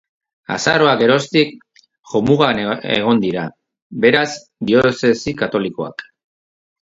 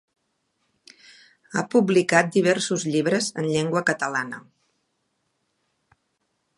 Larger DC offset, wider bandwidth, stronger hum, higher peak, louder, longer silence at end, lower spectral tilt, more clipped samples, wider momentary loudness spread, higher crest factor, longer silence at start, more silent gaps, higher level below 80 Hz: neither; second, 8 kHz vs 11.5 kHz; neither; about the same, 0 dBFS vs -2 dBFS; first, -16 LUFS vs -22 LUFS; second, 0.8 s vs 2.2 s; about the same, -5 dB/octave vs -4.5 dB/octave; neither; first, 13 LU vs 10 LU; second, 18 dB vs 24 dB; second, 0.5 s vs 1.5 s; first, 1.99-2.03 s, 3.82-3.90 s vs none; first, -52 dBFS vs -72 dBFS